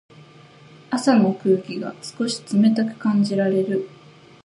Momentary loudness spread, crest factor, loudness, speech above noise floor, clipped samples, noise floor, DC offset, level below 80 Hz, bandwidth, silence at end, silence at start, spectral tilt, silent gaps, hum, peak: 12 LU; 18 dB; -21 LUFS; 27 dB; under 0.1%; -47 dBFS; under 0.1%; -70 dBFS; 11.5 kHz; 0.6 s; 0.9 s; -6 dB/octave; none; none; -4 dBFS